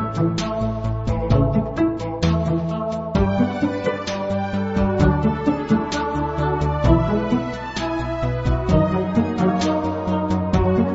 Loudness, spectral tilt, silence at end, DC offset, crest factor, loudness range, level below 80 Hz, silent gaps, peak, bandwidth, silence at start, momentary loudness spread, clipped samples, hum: -21 LUFS; -7.5 dB/octave; 0 s; under 0.1%; 16 dB; 1 LU; -30 dBFS; none; -4 dBFS; 8 kHz; 0 s; 6 LU; under 0.1%; none